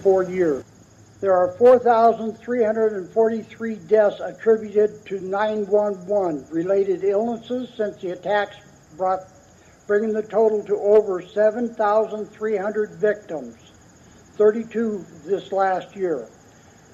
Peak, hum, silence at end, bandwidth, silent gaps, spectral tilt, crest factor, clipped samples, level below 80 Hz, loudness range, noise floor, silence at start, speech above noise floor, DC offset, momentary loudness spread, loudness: -4 dBFS; none; 0.65 s; 7.6 kHz; none; -6.5 dB/octave; 16 dB; under 0.1%; -62 dBFS; 5 LU; -51 dBFS; 0 s; 30 dB; under 0.1%; 11 LU; -21 LUFS